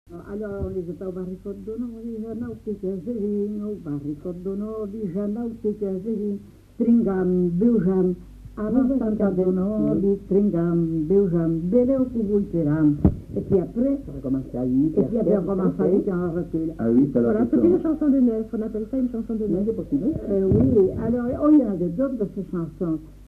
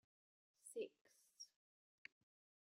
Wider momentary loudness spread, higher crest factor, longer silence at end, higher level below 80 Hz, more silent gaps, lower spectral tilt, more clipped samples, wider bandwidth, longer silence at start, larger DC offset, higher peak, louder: about the same, 12 LU vs 12 LU; second, 18 dB vs 24 dB; second, 0.05 s vs 1.25 s; first, -42 dBFS vs under -90 dBFS; second, none vs 1.01-1.05 s; first, -11.5 dB/octave vs -1.5 dB/octave; neither; second, 3.9 kHz vs 15.5 kHz; second, 0.1 s vs 0.65 s; neither; first, -4 dBFS vs -36 dBFS; first, -23 LUFS vs -57 LUFS